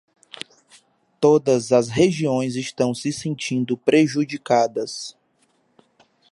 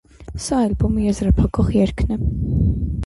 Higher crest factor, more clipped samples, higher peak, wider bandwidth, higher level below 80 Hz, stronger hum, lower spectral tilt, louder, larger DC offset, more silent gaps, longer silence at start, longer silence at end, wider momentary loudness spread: about the same, 18 dB vs 14 dB; neither; about the same, -4 dBFS vs -6 dBFS; about the same, 11.5 kHz vs 11.5 kHz; second, -60 dBFS vs -24 dBFS; neither; second, -5.5 dB/octave vs -7.5 dB/octave; about the same, -20 LUFS vs -19 LUFS; neither; neither; first, 1.2 s vs 0.2 s; first, 1.2 s vs 0 s; first, 17 LU vs 5 LU